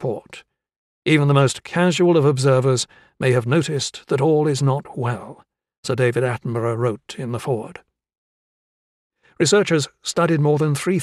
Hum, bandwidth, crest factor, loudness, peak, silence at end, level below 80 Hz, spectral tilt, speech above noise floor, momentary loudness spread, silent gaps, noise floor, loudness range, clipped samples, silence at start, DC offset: none; 13 kHz; 18 dB; -19 LUFS; -2 dBFS; 0 s; -62 dBFS; -5.5 dB/octave; over 71 dB; 11 LU; 0.76-1.02 s, 5.78-5.83 s, 8.18-9.10 s; under -90 dBFS; 6 LU; under 0.1%; 0 s; under 0.1%